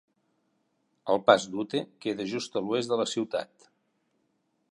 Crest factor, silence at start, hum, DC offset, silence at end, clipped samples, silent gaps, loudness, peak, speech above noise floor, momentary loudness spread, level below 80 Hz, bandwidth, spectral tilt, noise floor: 26 dB; 1.05 s; none; under 0.1%; 1.25 s; under 0.1%; none; -28 LUFS; -4 dBFS; 47 dB; 12 LU; -74 dBFS; 11.5 kHz; -4 dB/octave; -74 dBFS